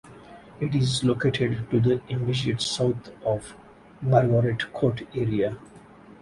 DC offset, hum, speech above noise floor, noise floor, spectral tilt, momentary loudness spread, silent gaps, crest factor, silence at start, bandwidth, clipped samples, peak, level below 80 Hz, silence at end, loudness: under 0.1%; none; 24 dB; -48 dBFS; -6 dB/octave; 8 LU; none; 20 dB; 0.05 s; 11.5 kHz; under 0.1%; -6 dBFS; -52 dBFS; 0.1 s; -25 LUFS